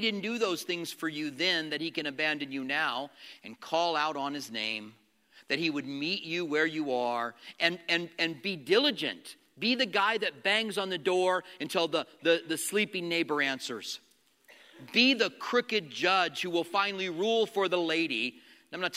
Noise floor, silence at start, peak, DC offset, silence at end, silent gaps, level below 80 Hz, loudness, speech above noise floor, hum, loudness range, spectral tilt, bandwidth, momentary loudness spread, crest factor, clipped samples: -61 dBFS; 0 s; -8 dBFS; under 0.1%; 0 s; none; -86 dBFS; -30 LUFS; 31 dB; none; 4 LU; -3 dB/octave; 16 kHz; 9 LU; 22 dB; under 0.1%